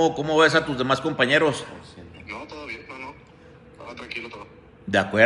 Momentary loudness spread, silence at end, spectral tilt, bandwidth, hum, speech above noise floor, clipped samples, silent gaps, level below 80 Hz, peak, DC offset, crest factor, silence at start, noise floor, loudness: 23 LU; 0 s; -4.5 dB/octave; 11.5 kHz; none; 28 dB; under 0.1%; none; -56 dBFS; -2 dBFS; under 0.1%; 22 dB; 0 s; -48 dBFS; -22 LUFS